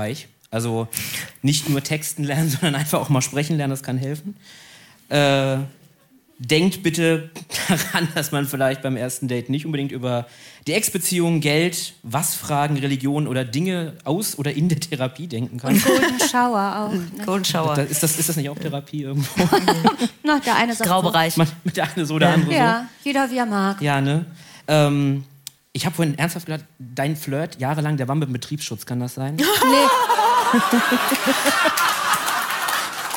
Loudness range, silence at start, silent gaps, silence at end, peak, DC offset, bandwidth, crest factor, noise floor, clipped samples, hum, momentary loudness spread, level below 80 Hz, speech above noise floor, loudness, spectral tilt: 5 LU; 0 s; none; 0 s; -4 dBFS; under 0.1%; 17 kHz; 18 dB; -55 dBFS; under 0.1%; none; 10 LU; -62 dBFS; 35 dB; -20 LUFS; -4.5 dB/octave